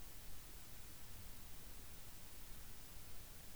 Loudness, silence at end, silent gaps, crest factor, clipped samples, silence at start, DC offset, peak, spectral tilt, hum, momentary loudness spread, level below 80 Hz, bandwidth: -54 LUFS; 0 s; none; 12 dB; under 0.1%; 0 s; 0.2%; -38 dBFS; -3 dB/octave; none; 0 LU; -60 dBFS; over 20 kHz